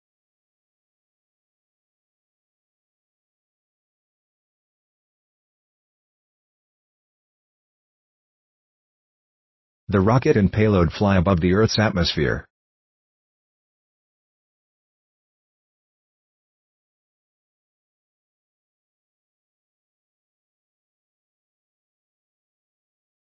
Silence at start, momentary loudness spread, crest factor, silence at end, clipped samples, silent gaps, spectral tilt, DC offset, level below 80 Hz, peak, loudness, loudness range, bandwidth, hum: 9.9 s; 6 LU; 24 dB; 10.9 s; under 0.1%; none; -6.5 dB/octave; under 0.1%; -42 dBFS; -4 dBFS; -19 LUFS; 10 LU; 6.2 kHz; none